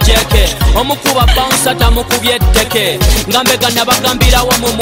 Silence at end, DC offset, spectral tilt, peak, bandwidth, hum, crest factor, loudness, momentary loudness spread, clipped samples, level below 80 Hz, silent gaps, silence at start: 0 s; under 0.1%; -3.5 dB/octave; 0 dBFS; 16.5 kHz; none; 10 dB; -10 LUFS; 3 LU; under 0.1%; -14 dBFS; none; 0 s